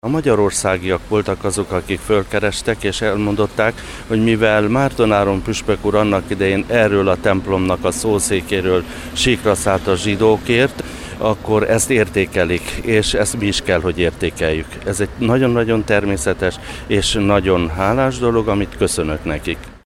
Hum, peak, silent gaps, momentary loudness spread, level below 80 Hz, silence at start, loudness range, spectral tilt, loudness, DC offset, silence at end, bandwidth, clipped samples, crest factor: none; -2 dBFS; none; 6 LU; -34 dBFS; 0.05 s; 2 LU; -4.5 dB/octave; -17 LUFS; under 0.1%; 0.05 s; 16 kHz; under 0.1%; 16 dB